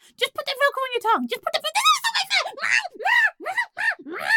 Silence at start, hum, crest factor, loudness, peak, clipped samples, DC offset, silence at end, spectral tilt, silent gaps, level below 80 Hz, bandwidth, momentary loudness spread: 0.2 s; none; 16 dB; -21 LUFS; -8 dBFS; under 0.1%; under 0.1%; 0 s; 0.5 dB/octave; none; -74 dBFS; 17.5 kHz; 7 LU